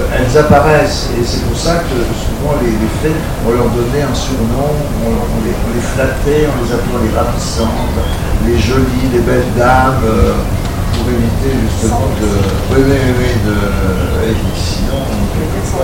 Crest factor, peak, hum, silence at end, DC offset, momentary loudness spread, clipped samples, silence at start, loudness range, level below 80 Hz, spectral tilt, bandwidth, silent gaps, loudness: 12 dB; 0 dBFS; none; 0 s; 2%; 6 LU; under 0.1%; 0 s; 2 LU; -18 dBFS; -6 dB/octave; 16.5 kHz; none; -13 LUFS